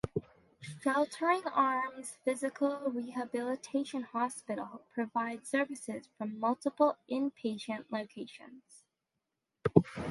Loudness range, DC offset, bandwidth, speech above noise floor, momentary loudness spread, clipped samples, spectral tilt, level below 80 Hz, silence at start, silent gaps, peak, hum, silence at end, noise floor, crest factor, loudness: 3 LU; under 0.1%; 11.5 kHz; 52 dB; 12 LU; under 0.1%; -6 dB/octave; -66 dBFS; 0.05 s; none; -6 dBFS; none; 0 s; -87 dBFS; 30 dB; -34 LUFS